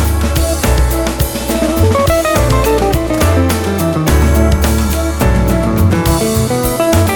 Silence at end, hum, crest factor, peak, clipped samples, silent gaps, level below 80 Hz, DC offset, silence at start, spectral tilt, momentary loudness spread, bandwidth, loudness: 0 s; none; 12 dB; 0 dBFS; under 0.1%; none; -16 dBFS; under 0.1%; 0 s; -5.5 dB/octave; 3 LU; 19.5 kHz; -13 LUFS